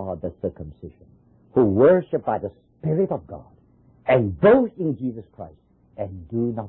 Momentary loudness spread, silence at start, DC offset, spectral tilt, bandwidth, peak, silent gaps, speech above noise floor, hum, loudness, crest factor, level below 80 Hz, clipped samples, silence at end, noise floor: 24 LU; 0 s; under 0.1%; -12.5 dB/octave; 4.1 kHz; -6 dBFS; none; 34 dB; none; -21 LUFS; 18 dB; -48 dBFS; under 0.1%; 0 s; -55 dBFS